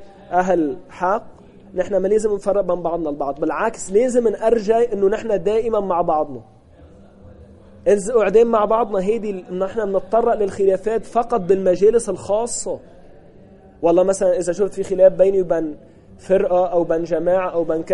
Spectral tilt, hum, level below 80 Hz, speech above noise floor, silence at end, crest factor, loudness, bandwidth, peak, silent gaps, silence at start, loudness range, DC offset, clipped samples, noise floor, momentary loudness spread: -6 dB/octave; none; -44 dBFS; 27 dB; 0 s; 16 dB; -19 LUFS; 11.5 kHz; -2 dBFS; none; 0 s; 3 LU; under 0.1%; under 0.1%; -45 dBFS; 9 LU